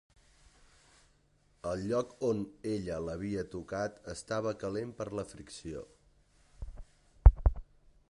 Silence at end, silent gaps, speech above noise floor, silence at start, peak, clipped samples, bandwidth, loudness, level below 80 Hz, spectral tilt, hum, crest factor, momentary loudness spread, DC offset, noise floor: 0.5 s; none; 32 dB; 1.65 s; -6 dBFS; under 0.1%; 11 kHz; -34 LUFS; -36 dBFS; -7 dB/octave; none; 28 dB; 22 LU; under 0.1%; -69 dBFS